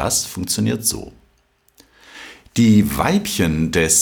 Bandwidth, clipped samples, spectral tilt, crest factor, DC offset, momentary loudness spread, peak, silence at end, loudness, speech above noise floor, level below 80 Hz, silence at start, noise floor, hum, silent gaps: over 20 kHz; under 0.1%; -4 dB/octave; 16 dB; under 0.1%; 19 LU; -2 dBFS; 0 s; -17 LUFS; 43 dB; -40 dBFS; 0 s; -60 dBFS; none; none